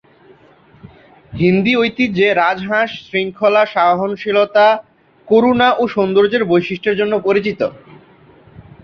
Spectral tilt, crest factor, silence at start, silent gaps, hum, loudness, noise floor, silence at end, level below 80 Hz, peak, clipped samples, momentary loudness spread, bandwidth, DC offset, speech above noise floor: -7 dB/octave; 14 dB; 0.85 s; none; none; -15 LUFS; -47 dBFS; 0.25 s; -52 dBFS; -2 dBFS; under 0.1%; 7 LU; 6.4 kHz; under 0.1%; 33 dB